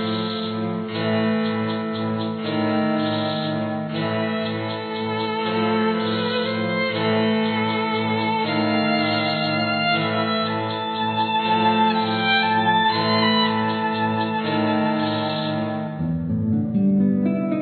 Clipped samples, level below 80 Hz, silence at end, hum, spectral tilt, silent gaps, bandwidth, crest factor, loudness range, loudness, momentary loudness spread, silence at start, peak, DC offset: under 0.1%; -58 dBFS; 0 s; none; -8.5 dB/octave; none; 4.6 kHz; 14 dB; 4 LU; -21 LUFS; 7 LU; 0 s; -6 dBFS; under 0.1%